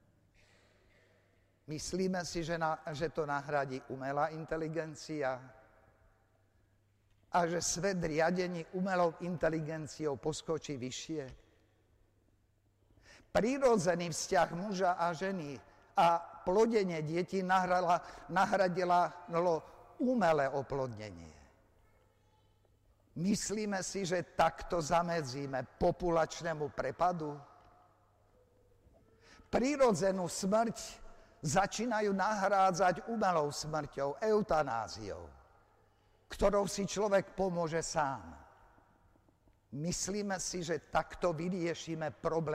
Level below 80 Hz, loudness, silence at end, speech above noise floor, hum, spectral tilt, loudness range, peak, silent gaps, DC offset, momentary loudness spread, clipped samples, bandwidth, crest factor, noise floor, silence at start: -58 dBFS; -34 LUFS; 0 s; 38 dB; none; -4.5 dB/octave; 7 LU; -14 dBFS; none; under 0.1%; 11 LU; under 0.1%; 15.5 kHz; 22 dB; -72 dBFS; 1.7 s